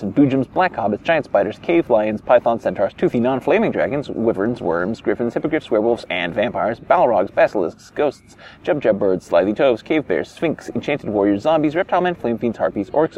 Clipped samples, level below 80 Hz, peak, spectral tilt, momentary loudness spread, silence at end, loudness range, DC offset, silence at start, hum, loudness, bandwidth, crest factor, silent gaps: under 0.1%; -52 dBFS; -2 dBFS; -7 dB/octave; 6 LU; 0 s; 2 LU; under 0.1%; 0 s; none; -19 LUFS; 11 kHz; 16 dB; none